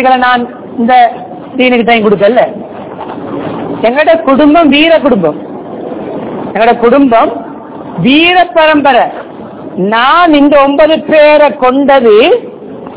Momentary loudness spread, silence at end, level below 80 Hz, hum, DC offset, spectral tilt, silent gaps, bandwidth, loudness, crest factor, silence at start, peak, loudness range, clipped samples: 17 LU; 0 s; -42 dBFS; none; under 0.1%; -9 dB/octave; none; 4 kHz; -7 LUFS; 8 dB; 0 s; 0 dBFS; 4 LU; 8%